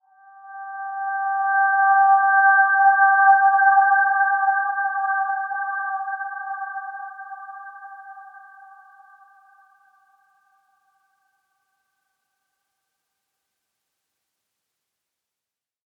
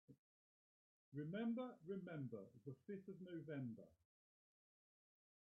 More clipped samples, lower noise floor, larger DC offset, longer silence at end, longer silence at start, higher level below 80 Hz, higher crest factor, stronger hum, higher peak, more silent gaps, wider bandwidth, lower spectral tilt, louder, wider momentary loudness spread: neither; about the same, -89 dBFS vs under -90 dBFS; neither; first, 7.5 s vs 1.5 s; first, 0.45 s vs 0.1 s; about the same, under -90 dBFS vs under -90 dBFS; about the same, 18 dB vs 16 dB; neither; first, -6 dBFS vs -38 dBFS; second, none vs 0.18-1.12 s; second, 1.7 kHz vs 3.8 kHz; second, -1.5 dB/octave vs -6.5 dB/octave; first, -18 LUFS vs -52 LUFS; first, 22 LU vs 11 LU